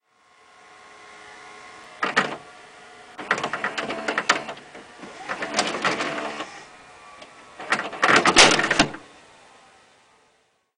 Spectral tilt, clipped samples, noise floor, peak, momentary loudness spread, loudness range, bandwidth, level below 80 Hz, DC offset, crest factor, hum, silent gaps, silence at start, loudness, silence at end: -1.5 dB/octave; under 0.1%; -65 dBFS; 0 dBFS; 28 LU; 9 LU; 15.5 kHz; -56 dBFS; under 0.1%; 26 dB; none; none; 1 s; -21 LUFS; 1.75 s